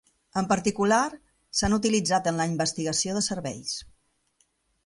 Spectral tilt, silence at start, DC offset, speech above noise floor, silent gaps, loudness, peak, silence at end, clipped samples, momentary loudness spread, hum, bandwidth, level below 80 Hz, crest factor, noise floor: -3.5 dB/octave; 0.35 s; under 0.1%; 44 dB; none; -26 LUFS; -10 dBFS; 1 s; under 0.1%; 9 LU; none; 11.5 kHz; -50 dBFS; 18 dB; -70 dBFS